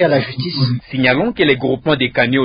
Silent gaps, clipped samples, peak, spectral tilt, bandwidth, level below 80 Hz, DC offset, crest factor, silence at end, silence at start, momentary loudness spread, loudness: none; under 0.1%; 0 dBFS; -11 dB/octave; 5.2 kHz; -46 dBFS; under 0.1%; 14 dB; 0 s; 0 s; 4 LU; -16 LUFS